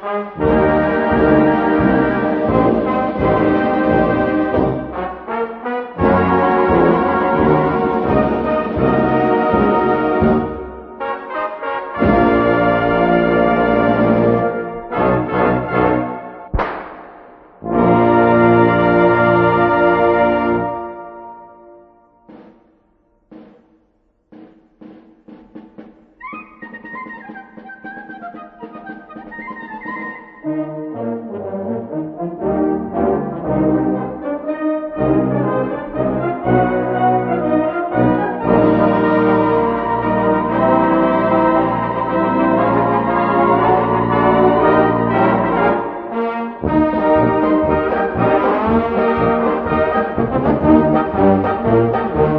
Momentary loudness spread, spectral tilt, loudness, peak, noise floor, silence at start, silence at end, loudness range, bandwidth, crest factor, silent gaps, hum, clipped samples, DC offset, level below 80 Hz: 17 LU; -10.5 dB/octave; -15 LUFS; 0 dBFS; -60 dBFS; 0 s; 0 s; 13 LU; 5.4 kHz; 16 dB; none; none; under 0.1%; under 0.1%; -38 dBFS